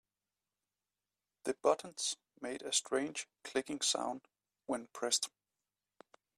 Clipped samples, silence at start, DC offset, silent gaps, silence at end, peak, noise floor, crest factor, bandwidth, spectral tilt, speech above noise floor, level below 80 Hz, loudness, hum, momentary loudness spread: under 0.1%; 1.45 s; under 0.1%; none; 1.1 s; -16 dBFS; under -90 dBFS; 24 dB; 14 kHz; -1 dB/octave; over 53 dB; -82 dBFS; -37 LUFS; 50 Hz at -80 dBFS; 11 LU